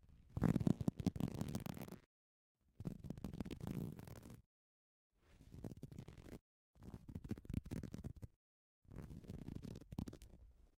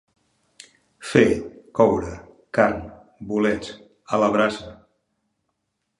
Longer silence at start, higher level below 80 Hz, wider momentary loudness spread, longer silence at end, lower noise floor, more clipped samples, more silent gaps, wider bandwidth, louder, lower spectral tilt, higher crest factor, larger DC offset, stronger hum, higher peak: second, 0.05 s vs 1 s; second, -60 dBFS vs -50 dBFS; about the same, 21 LU vs 20 LU; second, 0.25 s vs 1.25 s; first, under -90 dBFS vs -76 dBFS; neither; first, 2.06-2.55 s, 4.46-5.10 s, 6.41-6.74 s, 8.36-8.82 s vs none; first, 16.5 kHz vs 11.5 kHz; second, -47 LUFS vs -21 LUFS; first, -7.5 dB/octave vs -6 dB/octave; about the same, 26 dB vs 22 dB; neither; neither; second, -20 dBFS vs -2 dBFS